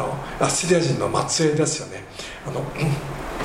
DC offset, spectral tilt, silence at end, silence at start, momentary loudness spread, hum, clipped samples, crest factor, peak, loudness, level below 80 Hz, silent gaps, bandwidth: under 0.1%; -4.5 dB/octave; 0 s; 0 s; 14 LU; none; under 0.1%; 18 dB; -4 dBFS; -22 LUFS; -42 dBFS; none; 16 kHz